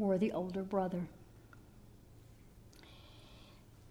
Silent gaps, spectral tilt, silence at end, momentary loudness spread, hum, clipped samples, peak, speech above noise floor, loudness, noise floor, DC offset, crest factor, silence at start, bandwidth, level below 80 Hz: none; -8 dB/octave; 0.05 s; 25 LU; none; under 0.1%; -22 dBFS; 23 dB; -37 LUFS; -59 dBFS; under 0.1%; 20 dB; 0 s; 17 kHz; -64 dBFS